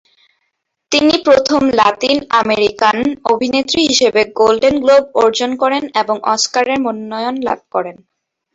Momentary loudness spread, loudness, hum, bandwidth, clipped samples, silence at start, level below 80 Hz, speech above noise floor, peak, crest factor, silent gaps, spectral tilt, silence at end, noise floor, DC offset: 8 LU; -13 LUFS; none; 8 kHz; under 0.1%; 0.9 s; -50 dBFS; 56 dB; 0 dBFS; 14 dB; none; -2.5 dB/octave; 0.6 s; -70 dBFS; under 0.1%